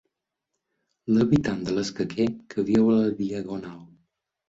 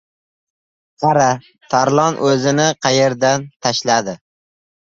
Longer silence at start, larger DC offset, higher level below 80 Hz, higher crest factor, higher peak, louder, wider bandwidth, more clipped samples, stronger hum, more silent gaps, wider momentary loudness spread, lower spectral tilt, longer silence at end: about the same, 1.05 s vs 1 s; neither; about the same, -56 dBFS vs -58 dBFS; about the same, 18 dB vs 16 dB; second, -8 dBFS vs 0 dBFS; second, -24 LUFS vs -16 LUFS; about the same, 7.8 kHz vs 7.8 kHz; neither; neither; second, none vs 3.56-3.60 s; first, 14 LU vs 6 LU; first, -7 dB/octave vs -4 dB/octave; second, 0.65 s vs 0.8 s